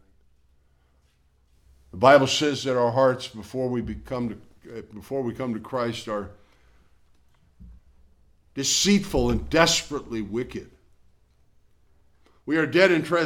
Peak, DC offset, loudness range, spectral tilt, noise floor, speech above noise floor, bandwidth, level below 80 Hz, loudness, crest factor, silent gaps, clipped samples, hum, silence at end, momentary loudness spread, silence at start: -4 dBFS; under 0.1%; 10 LU; -4 dB/octave; -63 dBFS; 40 dB; 17.5 kHz; -46 dBFS; -23 LUFS; 22 dB; none; under 0.1%; none; 0 s; 21 LU; 1.95 s